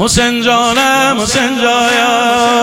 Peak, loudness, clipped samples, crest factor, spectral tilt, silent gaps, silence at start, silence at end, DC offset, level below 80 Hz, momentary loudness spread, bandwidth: 0 dBFS; -10 LUFS; under 0.1%; 10 dB; -2.5 dB/octave; none; 0 s; 0 s; under 0.1%; -34 dBFS; 2 LU; 17 kHz